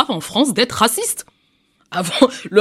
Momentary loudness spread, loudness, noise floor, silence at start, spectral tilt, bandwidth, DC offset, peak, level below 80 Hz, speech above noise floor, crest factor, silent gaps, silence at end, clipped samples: 9 LU; -17 LUFS; -61 dBFS; 0 s; -3 dB/octave; 16 kHz; under 0.1%; 0 dBFS; -56 dBFS; 44 dB; 18 dB; none; 0 s; under 0.1%